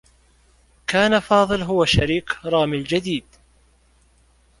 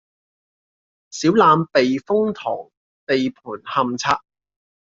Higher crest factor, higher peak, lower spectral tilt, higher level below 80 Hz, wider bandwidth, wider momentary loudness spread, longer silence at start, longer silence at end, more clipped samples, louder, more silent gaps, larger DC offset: about the same, 20 dB vs 18 dB; about the same, -2 dBFS vs -2 dBFS; about the same, -5 dB/octave vs -5 dB/octave; first, -42 dBFS vs -62 dBFS; first, 11.5 kHz vs 7.8 kHz; second, 8 LU vs 15 LU; second, 0.9 s vs 1.15 s; first, 1.4 s vs 0.7 s; neither; about the same, -20 LUFS vs -19 LUFS; second, none vs 2.77-3.07 s; neither